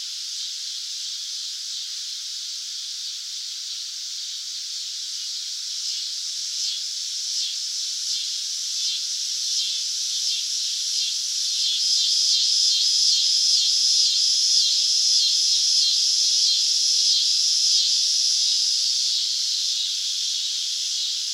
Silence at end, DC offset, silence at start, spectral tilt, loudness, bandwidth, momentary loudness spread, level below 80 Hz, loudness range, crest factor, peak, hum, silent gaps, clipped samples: 0 s; under 0.1%; 0 s; 12 dB/octave; -20 LUFS; 16 kHz; 12 LU; under -90 dBFS; 12 LU; 18 dB; -6 dBFS; none; none; under 0.1%